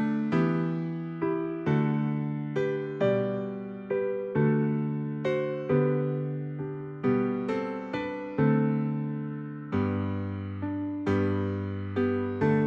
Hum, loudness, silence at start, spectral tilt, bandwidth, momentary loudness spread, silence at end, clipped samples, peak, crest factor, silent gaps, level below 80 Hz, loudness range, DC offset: none; -29 LUFS; 0 s; -9.5 dB/octave; 6.8 kHz; 8 LU; 0 s; under 0.1%; -14 dBFS; 16 dB; none; -64 dBFS; 2 LU; under 0.1%